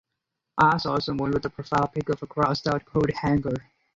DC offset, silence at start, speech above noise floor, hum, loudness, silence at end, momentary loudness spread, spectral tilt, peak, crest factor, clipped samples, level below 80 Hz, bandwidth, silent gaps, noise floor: under 0.1%; 0.55 s; 58 dB; none; -25 LUFS; 0.35 s; 8 LU; -7 dB/octave; -6 dBFS; 18 dB; under 0.1%; -50 dBFS; 7.8 kHz; none; -83 dBFS